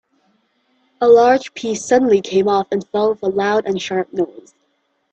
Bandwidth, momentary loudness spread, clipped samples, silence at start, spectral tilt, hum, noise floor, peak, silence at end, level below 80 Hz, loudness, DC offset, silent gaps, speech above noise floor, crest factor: 8.6 kHz; 12 LU; under 0.1%; 1 s; -4.5 dB/octave; none; -66 dBFS; 0 dBFS; 0.7 s; -60 dBFS; -16 LUFS; under 0.1%; none; 50 dB; 16 dB